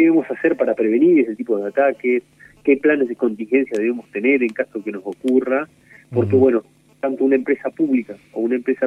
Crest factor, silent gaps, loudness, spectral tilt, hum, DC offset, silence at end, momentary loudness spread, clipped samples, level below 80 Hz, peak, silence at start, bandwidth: 16 dB; none; -19 LUFS; -8.5 dB/octave; none; under 0.1%; 0 s; 10 LU; under 0.1%; -64 dBFS; -2 dBFS; 0 s; 10 kHz